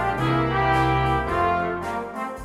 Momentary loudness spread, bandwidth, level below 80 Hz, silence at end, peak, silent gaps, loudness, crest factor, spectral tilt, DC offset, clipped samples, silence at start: 9 LU; 13 kHz; -36 dBFS; 0 s; -10 dBFS; none; -23 LUFS; 14 dB; -7 dB/octave; under 0.1%; under 0.1%; 0 s